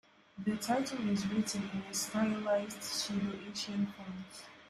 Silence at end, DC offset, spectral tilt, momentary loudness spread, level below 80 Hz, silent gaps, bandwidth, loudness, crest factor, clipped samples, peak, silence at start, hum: 0 s; under 0.1%; -4 dB/octave; 11 LU; -70 dBFS; none; 14.5 kHz; -36 LUFS; 16 dB; under 0.1%; -20 dBFS; 0.35 s; none